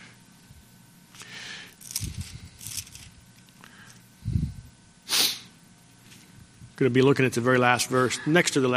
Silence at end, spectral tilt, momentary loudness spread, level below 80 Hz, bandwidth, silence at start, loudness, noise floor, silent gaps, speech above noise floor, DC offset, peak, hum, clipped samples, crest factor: 0 s; -4 dB/octave; 21 LU; -48 dBFS; 15.5 kHz; 0 s; -24 LUFS; -54 dBFS; none; 32 dB; under 0.1%; -4 dBFS; none; under 0.1%; 24 dB